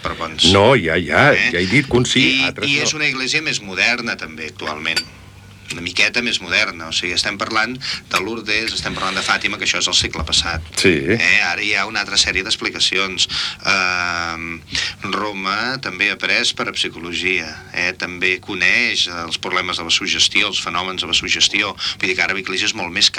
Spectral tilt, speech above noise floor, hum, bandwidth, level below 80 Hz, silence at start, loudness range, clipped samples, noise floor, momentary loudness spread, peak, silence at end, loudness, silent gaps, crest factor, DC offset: -2.5 dB/octave; 22 dB; none; 18 kHz; -44 dBFS; 0 s; 4 LU; under 0.1%; -40 dBFS; 8 LU; 0 dBFS; 0 s; -16 LUFS; none; 18 dB; under 0.1%